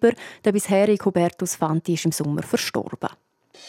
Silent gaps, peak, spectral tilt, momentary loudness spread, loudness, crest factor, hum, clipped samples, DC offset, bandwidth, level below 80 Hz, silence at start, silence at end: none; -4 dBFS; -5 dB/octave; 9 LU; -23 LUFS; 18 dB; none; under 0.1%; under 0.1%; 16.5 kHz; -66 dBFS; 0 s; 0 s